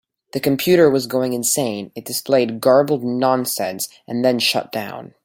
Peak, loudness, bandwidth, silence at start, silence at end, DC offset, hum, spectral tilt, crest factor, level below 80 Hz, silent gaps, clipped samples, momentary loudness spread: -2 dBFS; -18 LUFS; 17 kHz; 0.35 s; 0.2 s; under 0.1%; none; -4 dB/octave; 16 dB; -62 dBFS; none; under 0.1%; 13 LU